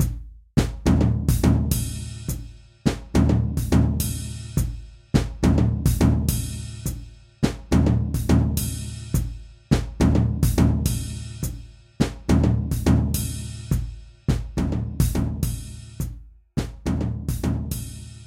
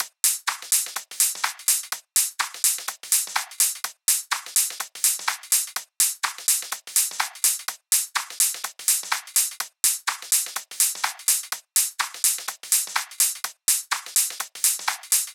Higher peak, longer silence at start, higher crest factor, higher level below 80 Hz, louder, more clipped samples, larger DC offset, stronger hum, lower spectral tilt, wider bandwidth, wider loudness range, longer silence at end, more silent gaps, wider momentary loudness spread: about the same, -4 dBFS vs -2 dBFS; about the same, 0 s vs 0 s; about the same, 20 dB vs 24 dB; first, -28 dBFS vs under -90 dBFS; about the same, -24 LUFS vs -22 LUFS; neither; neither; neither; first, -6.5 dB/octave vs 5.5 dB/octave; second, 16.5 kHz vs over 20 kHz; first, 5 LU vs 1 LU; about the same, 0 s vs 0 s; neither; first, 12 LU vs 5 LU